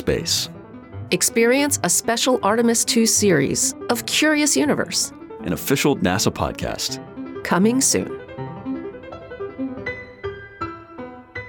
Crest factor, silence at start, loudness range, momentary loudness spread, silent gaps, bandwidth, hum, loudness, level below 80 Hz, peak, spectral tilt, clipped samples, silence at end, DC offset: 16 dB; 0 s; 6 LU; 17 LU; none; 19 kHz; none; -19 LUFS; -48 dBFS; -6 dBFS; -3 dB/octave; under 0.1%; 0 s; under 0.1%